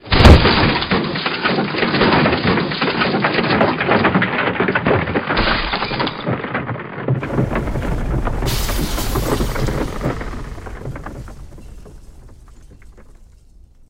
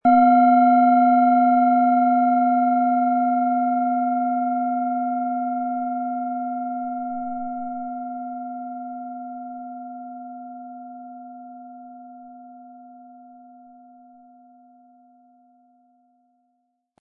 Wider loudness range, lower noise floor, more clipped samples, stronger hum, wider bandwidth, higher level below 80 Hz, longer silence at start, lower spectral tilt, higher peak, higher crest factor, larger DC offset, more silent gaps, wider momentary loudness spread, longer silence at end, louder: second, 13 LU vs 23 LU; second, -45 dBFS vs -72 dBFS; neither; neither; first, 16 kHz vs 4.3 kHz; first, -24 dBFS vs -72 dBFS; about the same, 0.05 s vs 0.05 s; second, -5.5 dB/octave vs -10.5 dB/octave; first, 0 dBFS vs -6 dBFS; about the same, 18 dB vs 16 dB; neither; neither; second, 14 LU vs 24 LU; second, 0.65 s vs 3.9 s; first, -17 LUFS vs -20 LUFS